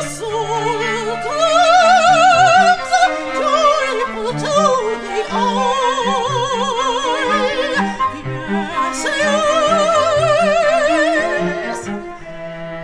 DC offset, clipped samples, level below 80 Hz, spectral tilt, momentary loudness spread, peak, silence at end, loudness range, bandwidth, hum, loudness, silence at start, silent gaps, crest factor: under 0.1%; under 0.1%; -44 dBFS; -3.5 dB/octave; 12 LU; -2 dBFS; 0 s; 5 LU; 11 kHz; none; -15 LUFS; 0 s; none; 14 dB